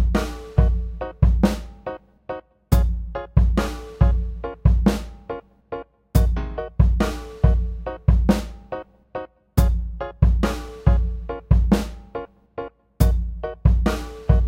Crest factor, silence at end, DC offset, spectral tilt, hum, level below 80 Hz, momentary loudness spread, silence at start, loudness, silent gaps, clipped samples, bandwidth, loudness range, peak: 18 dB; 0 s; under 0.1%; -7.5 dB/octave; none; -22 dBFS; 15 LU; 0 s; -22 LUFS; none; under 0.1%; 16 kHz; 1 LU; -2 dBFS